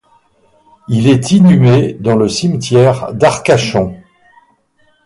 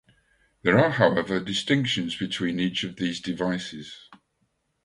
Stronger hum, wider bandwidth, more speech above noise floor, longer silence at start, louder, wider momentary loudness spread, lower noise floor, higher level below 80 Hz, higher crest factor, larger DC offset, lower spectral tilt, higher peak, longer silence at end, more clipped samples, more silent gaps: neither; about the same, 11.5 kHz vs 11.5 kHz; about the same, 45 dB vs 48 dB; first, 0.9 s vs 0.65 s; first, -11 LUFS vs -25 LUFS; second, 8 LU vs 13 LU; second, -55 dBFS vs -73 dBFS; first, -44 dBFS vs -58 dBFS; second, 12 dB vs 22 dB; neither; first, -6.5 dB/octave vs -5 dB/octave; first, 0 dBFS vs -4 dBFS; first, 1.1 s vs 0.7 s; neither; neither